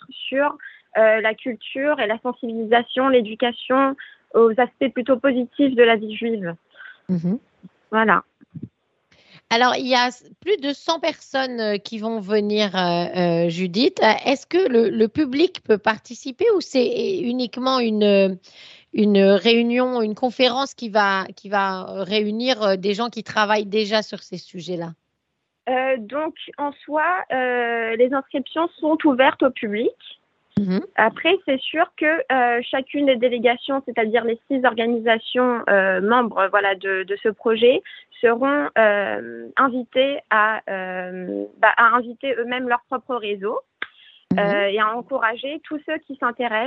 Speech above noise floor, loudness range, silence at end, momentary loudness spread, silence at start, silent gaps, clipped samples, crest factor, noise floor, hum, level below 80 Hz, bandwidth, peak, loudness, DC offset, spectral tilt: 56 dB; 4 LU; 0 s; 12 LU; 0.1 s; none; under 0.1%; 20 dB; -76 dBFS; none; -68 dBFS; 7.8 kHz; 0 dBFS; -20 LUFS; under 0.1%; -5.5 dB/octave